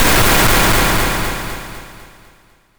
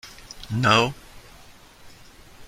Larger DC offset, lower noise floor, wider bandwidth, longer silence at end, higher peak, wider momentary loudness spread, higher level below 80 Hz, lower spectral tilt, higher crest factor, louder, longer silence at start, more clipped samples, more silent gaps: neither; about the same, -50 dBFS vs -48 dBFS; first, over 20 kHz vs 16 kHz; first, 0.75 s vs 0 s; about the same, -2 dBFS vs -2 dBFS; second, 19 LU vs 23 LU; first, -24 dBFS vs -50 dBFS; second, -3 dB/octave vs -4.5 dB/octave; second, 12 dB vs 24 dB; first, -13 LUFS vs -21 LUFS; about the same, 0 s vs 0.05 s; neither; neither